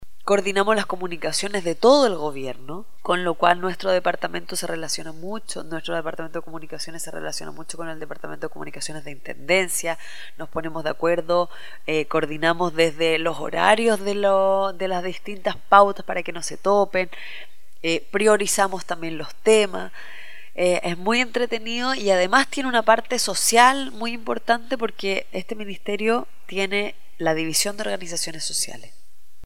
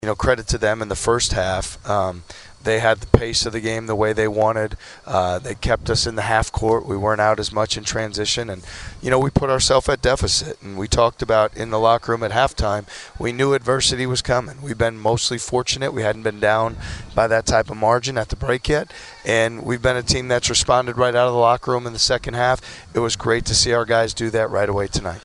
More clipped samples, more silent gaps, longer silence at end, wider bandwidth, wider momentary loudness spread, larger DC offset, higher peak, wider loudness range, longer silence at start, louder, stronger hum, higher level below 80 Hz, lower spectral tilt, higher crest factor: neither; neither; first, 0.6 s vs 0.05 s; first, 16.5 kHz vs 11.5 kHz; first, 16 LU vs 8 LU; first, 3% vs under 0.1%; about the same, 0 dBFS vs 0 dBFS; first, 9 LU vs 2 LU; about the same, 0 s vs 0 s; second, -22 LUFS vs -19 LUFS; neither; second, -62 dBFS vs -36 dBFS; about the same, -3 dB/octave vs -3.5 dB/octave; about the same, 22 dB vs 20 dB